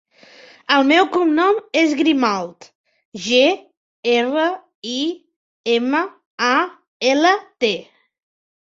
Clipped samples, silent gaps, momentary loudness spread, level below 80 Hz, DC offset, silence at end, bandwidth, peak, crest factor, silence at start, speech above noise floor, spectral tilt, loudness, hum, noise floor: under 0.1%; 2.75-2.84 s, 3.05-3.12 s, 3.77-4.03 s, 4.75-4.82 s, 5.36-5.64 s, 6.26-6.38 s, 6.88-7.00 s; 14 LU; -68 dBFS; under 0.1%; 0.8 s; 7.8 kHz; -2 dBFS; 18 dB; 0.7 s; 29 dB; -3 dB/octave; -18 LUFS; none; -46 dBFS